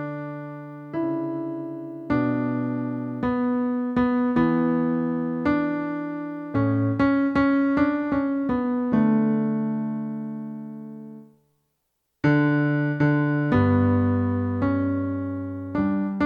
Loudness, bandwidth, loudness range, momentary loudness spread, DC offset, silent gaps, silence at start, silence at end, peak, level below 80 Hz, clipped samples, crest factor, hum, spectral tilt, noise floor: -24 LUFS; 5.2 kHz; 5 LU; 12 LU; under 0.1%; none; 0 s; 0 s; -8 dBFS; -52 dBFS; under 0.1%; 16 dB; none; -10 dB/octave; -76 dBFS